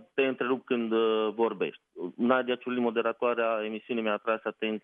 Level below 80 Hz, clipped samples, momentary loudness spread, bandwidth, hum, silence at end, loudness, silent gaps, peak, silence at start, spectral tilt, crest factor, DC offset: -88 dBFS; under 0.1%; 6 LU; 4.4 kHz; none; 0.05 s; -29 LUFS; none; -10 dBFS; 0 s; -8 dB/octave; 20 dB; under 0.1%